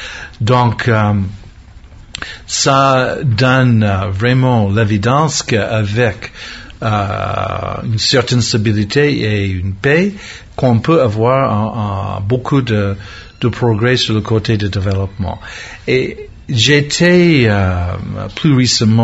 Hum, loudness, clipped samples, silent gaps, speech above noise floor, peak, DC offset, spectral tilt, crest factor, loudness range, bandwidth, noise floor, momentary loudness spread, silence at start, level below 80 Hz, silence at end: none; -13 LUFS; under 0.1%; none; 24 dB; 0 dBFS; under 0.1%; -5.5 dB/octave; 14 dB; 3 LU; 8 kHz; -37 dBFS; 13 LU; 0 s; -34 dBFS; 0 s